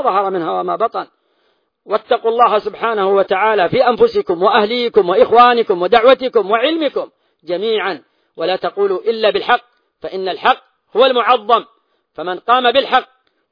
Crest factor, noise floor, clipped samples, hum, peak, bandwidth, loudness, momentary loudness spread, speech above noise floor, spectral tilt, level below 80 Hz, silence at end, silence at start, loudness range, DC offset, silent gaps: 14 dB; -62 dBFS; under 0.1%; none; 0 dBFS; 5.2 kHz; -14 LUFS; 13 LU; 48 dB; -6.5 dB/octave; -56 dBFS; 0.45 s; 0 s; 6 LU; under 0.1%; none